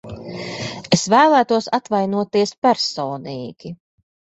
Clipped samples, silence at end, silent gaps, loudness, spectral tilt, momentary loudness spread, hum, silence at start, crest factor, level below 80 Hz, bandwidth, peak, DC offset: under 0.1%; 0.6 s; 2.58-2.62 s; -18 LUFS; -4.5 dB/octave; 18 LU; none; 0.05 s; 18 dB; -56 dBFS; 8.2 kHz; -2 dBFS; under 0.1%